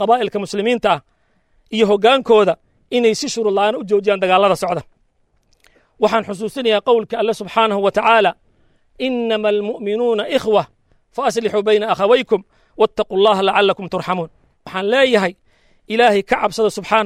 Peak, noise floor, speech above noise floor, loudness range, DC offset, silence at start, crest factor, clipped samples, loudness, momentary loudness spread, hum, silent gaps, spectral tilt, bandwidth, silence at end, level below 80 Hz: -2 dBFS; -61 dBFS; 45 dB; 2 LU; under 0.1%; 0 s; 16 dB; under 0.1%; -17 LUFS; 9 LU; none; none; -4.5 dB/octave; 13 kHz; 0 s; -54 dBFS